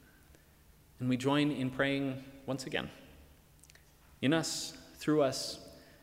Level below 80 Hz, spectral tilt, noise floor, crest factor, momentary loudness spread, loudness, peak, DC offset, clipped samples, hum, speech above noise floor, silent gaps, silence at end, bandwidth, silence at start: -64 dBFS; -4.5 dB/octave; -62 dBFS; 18 dB; 14 LU; -34 LUFS; -18 dBFS; under 0.1%; under 0.1%; none; 29 dB; none; 0.2 s; 16 kHz; 1 s